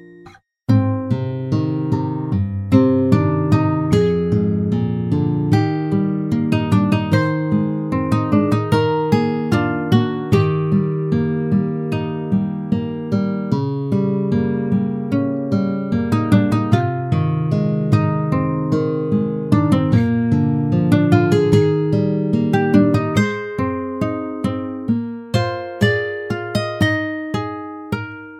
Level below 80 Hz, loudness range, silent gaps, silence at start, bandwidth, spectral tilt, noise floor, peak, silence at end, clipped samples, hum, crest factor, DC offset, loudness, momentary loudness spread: -46 dBFS; 5 LU; none; 0 s; 12 kHz; -8.5 dB/octave; -45 dBFS; 0 dBFS; 0 s; under 0.1%; none; 18 dB; under 0.1%; -18 LUFS; 7 LU